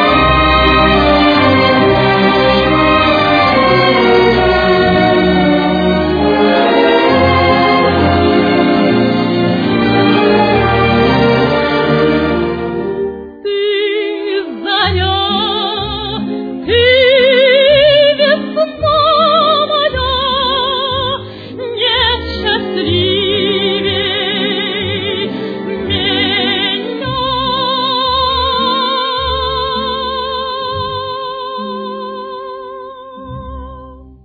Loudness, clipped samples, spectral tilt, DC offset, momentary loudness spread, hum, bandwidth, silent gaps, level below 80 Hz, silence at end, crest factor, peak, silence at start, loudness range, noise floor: -12 LUFS; under 0.1%; -7.5 dB/octave; under 0.1%; 12 LU; none; 5 kHz; none; -30 dBFS; 0.2 s; 12 dB; 0 dBFS; 0 s; 6 LU; -34 dBFS